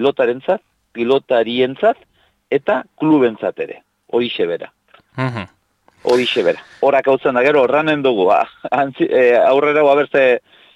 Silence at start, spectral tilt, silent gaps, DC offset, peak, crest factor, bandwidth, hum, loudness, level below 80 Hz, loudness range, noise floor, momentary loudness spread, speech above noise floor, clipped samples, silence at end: 0 s; -6 dB/octave; none; under 0.1%; -4 dBFS; 12 dB; 11 kHz; none; -16 LUFS; -62 dBFS; 6 LU; -55 dBFS; 11 LU; 40 dB; under 0.1%; 0.35 s